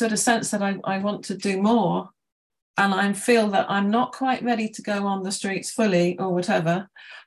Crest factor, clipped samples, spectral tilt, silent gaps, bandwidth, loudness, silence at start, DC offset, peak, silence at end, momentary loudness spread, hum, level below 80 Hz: 16 dB; under 0.1%; -4.5 dB/octave; 2.32-2.50 s, 2.62-2.74 s; 12.5 kHz; -23 LUFS; 0 s; under 0.1%; -6 dBFS; 0.05 s; 7 LU; none; -68 dBFS